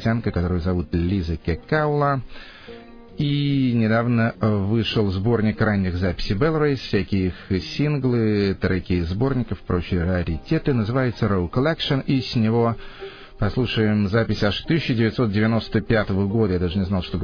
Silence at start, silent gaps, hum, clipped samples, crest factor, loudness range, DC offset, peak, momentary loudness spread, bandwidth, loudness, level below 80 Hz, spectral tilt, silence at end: 0 s; none; none; under 0.1%; 16 dB; 2 LU; under 0.1%; -6 dBFS; 6 LU; 5.4 kHz; -22 LUFS; -38 dBFS; -8 dB/octave; 0 s